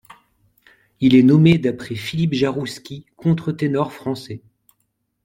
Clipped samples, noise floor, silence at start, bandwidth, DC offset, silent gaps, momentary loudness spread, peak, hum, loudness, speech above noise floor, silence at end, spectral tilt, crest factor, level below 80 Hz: under 0.1%; -71 dBFS; 1 s; 13.5 kHz; under 0.1%; none; 19 LU; -2 dBFS; none; -18 LUFS; 53 dB; 0.85 s; -7.5 dB/octave; 18 dB; -54 dBFS